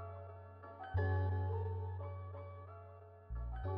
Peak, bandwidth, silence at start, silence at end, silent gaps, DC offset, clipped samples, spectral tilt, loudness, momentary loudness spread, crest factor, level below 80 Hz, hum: -26 dBFS; 4.1 kHz; 0 s; 0 s; none; under 0.1%; under 0.1%; -8 dB/octave; -42 LUFS; 17 LU; 16 dB; -52 dBFS; none